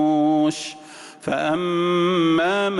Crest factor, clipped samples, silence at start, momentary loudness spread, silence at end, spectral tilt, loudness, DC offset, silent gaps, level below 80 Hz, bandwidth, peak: 10 dB; under 0.1%; 0 s; 15 LU; 0 s; -5.5 dB/octave; -20 LUFS; under 0.1%; none; -62 dBFS; 11.5 kHz; -10 dBFS